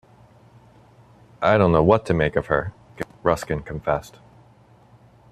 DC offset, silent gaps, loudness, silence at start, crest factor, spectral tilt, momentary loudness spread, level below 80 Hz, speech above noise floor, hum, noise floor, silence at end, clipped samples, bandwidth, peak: under 0.1%; none; -21 LUFS; 1.4 s; 22 dB; -7 dB/octave; 14 LU; -44 dBFS; 33 dB; none; -53 dBFS; 1.25 s; under 0.1%; 13.5 kHz; -2 dBFS